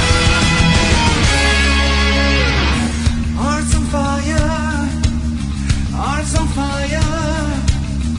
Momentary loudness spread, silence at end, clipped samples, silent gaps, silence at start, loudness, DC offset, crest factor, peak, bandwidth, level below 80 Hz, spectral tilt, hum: 7 LU; 0 s; under 0.1%; none; 0 s; -15 LUFS; under 0.1%; 14 dB; -2 dBFS; 11 kHz; -20 dBFS; -4.5 dB/octave; none